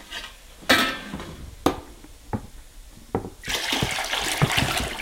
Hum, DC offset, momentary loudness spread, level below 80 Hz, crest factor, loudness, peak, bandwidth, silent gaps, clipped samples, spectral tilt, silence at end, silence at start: none; under 0.1%; 17 LU; -42 dBFS; 24 dB; -24 LUFS; -4 dBFS; 17 kHz; none; under 0.1%; -3 dB/octave; 0 s; 0 s